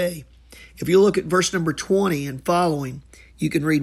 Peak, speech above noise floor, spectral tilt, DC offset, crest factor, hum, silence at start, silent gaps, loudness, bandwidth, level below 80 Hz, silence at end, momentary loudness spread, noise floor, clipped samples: -6 dBFS; 26 dB; -5 dB/octave; under 0.1%; 16 dB; none; 0 s; none; -21 LUFS; 15 kHz; -50 dBFS; 0 s; 14 LU; -46 dBFS; under 0.1%